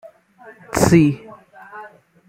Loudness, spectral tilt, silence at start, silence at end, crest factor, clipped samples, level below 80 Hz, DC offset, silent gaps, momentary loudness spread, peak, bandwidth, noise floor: -16 LUFS; -6 dB/octave; 0.75 s; 0.4 s; 18 dB; under 0.1%; -46 dBFS; under 0.1%; none; 25 LU; -2 dBFS; 16.5 kHz; -46 dBFS